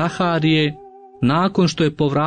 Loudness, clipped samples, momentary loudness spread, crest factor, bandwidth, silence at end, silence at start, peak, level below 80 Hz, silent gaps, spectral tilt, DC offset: -18 LUFS; under 0.1%; 6 LU; 12 dB; 9.4 kHz; 0 s; 0 s; -6 dBFS; -52 dBFS; none; -6.5 dB/octave; under 0.1%